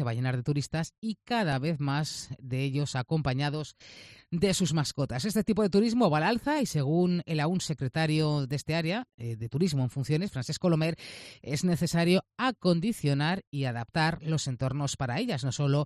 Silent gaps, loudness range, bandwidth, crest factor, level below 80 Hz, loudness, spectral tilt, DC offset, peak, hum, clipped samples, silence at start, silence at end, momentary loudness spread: 0.98-1.02 s, 9.14-9.18 s, 13.47-13.52 s; 4 LU; 14 kHz; 18 dB; -58 dBFS; -29 LUFS; -5.5 dB/octave; under 0.1%; -12 dBFS; none; under 0.1%; 0 s; 0 s; 9 LU